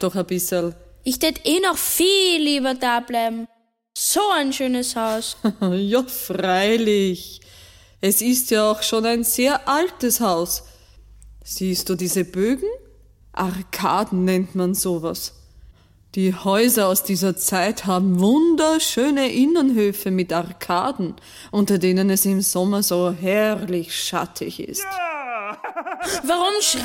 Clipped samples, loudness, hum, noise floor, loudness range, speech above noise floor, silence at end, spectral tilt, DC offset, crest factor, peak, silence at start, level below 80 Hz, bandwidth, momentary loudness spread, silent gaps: under 0.1%; -20 LUFS; none; -49 dBFS; 5 LU; 29 dB; 0 s; -4 dB/octave; under 0.1%; 16 dB; -4 dBFS; 0 s; -52 dBFS; 17 kHz; 11 LU; none